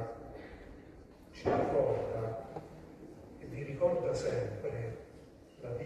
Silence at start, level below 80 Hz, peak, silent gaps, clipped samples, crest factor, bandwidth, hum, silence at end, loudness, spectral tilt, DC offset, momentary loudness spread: 0 s; -58 dBFS; -18 dBFS; none; under 0.1%; 18 dB; 12.5 kHz; none; 0 s; -35 LUFS; -7 dB/octave; under 0.1%; 22 LU